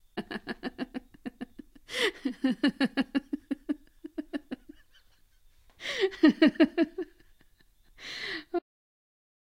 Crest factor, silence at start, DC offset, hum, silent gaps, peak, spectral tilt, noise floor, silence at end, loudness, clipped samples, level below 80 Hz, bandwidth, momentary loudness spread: 24 dB; 0.15 s; under 0.1%; none; none; -8 dBFS; -4.5 dB/octave; -62 dBFS; 1 s; -30 LUFS; under 0.1%; -62 dBFS; 14 kHz; 19 LU